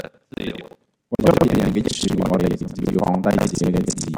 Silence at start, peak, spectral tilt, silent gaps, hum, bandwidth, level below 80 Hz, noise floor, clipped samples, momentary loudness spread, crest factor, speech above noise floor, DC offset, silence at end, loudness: 0 s; 0 dBFS; -6 dB/octave; none; none; 16.5 kHz; -40 dBFS; -46 dBFS; under 0.1%; 14 LU; 20 dB; 28 dB; under 0.1%; 0 s; -20 LUFS